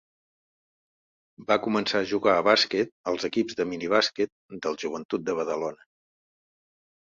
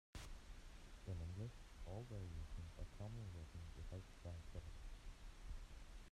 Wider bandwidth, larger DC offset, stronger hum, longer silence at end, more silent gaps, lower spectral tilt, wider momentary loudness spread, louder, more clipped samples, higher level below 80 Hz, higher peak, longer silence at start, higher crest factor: second, 7.8 kHz vs 13.5 kHz; neither; neither; first, 1.3 s vs 0.05 s; first, 2.92-3.04 s, 4.32-4.49 s, 5.05-5.09 s vs none; second, -4 dB/octave vs -6 dB/octave; about the same, 11 LU vs 9 LU; first, -26 LUFS vs -56 LUFS; neither; second, -68 dBFS vs -56 dBFS; first, -6 dBFS vs -38 dBFS; first, 1.4 s vs 0.15 s; first, 22 dB vs 16 dB